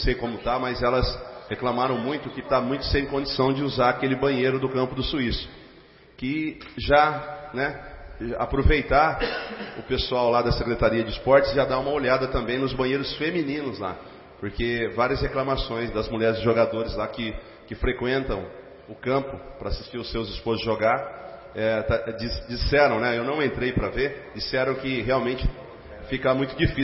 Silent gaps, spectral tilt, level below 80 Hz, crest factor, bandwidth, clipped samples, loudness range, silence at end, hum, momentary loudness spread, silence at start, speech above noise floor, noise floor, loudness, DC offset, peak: none; -9.5 dB/octave; -36 dBFS; 20 dB; 5.8 kHz; under 0.1%; 5 LU; 0 s; none; 13 LU; 0 s; 27 dB; -51 dBFS; -25 LUFS; under 0.1%; -4 dBFS